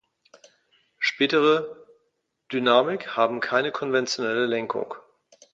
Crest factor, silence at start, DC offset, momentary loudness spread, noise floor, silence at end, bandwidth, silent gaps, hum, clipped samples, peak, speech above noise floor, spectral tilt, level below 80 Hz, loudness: 20 dB; 1 s; under 0.1%; 11 LU; -74 dBFS; 0.55 s; 7.8 kHz; none; none; under 0.1%; -4 dBFS; 51 dB; -4 dB/octave; -74 dBFS; -23 LUFS